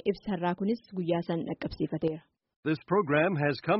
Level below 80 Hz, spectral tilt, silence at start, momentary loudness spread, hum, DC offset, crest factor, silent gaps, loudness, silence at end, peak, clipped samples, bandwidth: -60 dBFS; -5.5 dB/octave; 0.05 s; 8 LU; none; under 0.1%; 18 dB; 2.56-2.63 s; -30 LUFS; 0 s; -12 dBFS; under 0.1%; 5.8 kHz